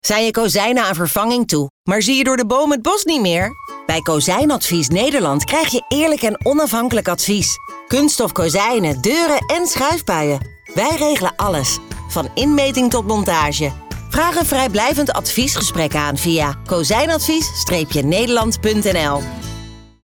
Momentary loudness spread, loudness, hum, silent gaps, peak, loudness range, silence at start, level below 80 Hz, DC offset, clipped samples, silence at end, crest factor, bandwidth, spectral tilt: 6 LU; -16 LUFS; none; 1.70-1.84 s; -6 dBFS; 1 LU; 0.05 s; -38 dBFS; under 0.1%; under 0.1%; 0.2 s; 10 dB; over 20 kHz; -3.5 dB/octave